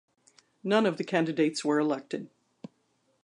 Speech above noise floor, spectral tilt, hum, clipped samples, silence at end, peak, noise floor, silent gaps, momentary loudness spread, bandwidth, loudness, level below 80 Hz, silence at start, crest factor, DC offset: 45 dB; -5.5 dB/octave; none; under 0.1%; 1 s; -10 dBFS; -72 dBFS; none; 13 LU; 11 kHz; -28 LUFS; -82 dBFS; 0.65 s; 20 dB; under 0.1%